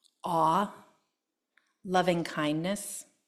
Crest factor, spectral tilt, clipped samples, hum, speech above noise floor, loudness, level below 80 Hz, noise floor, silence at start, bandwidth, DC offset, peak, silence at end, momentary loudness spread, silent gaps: 20 dB; -5 dB/octave; under 0.1%; none; 55 dB; -30 LUFS; -70 dBFS; -84 dBFS; 0.25 s; 14 kHz; under 0.1%; -12 dBFS; 0.25 s; 10 LU; none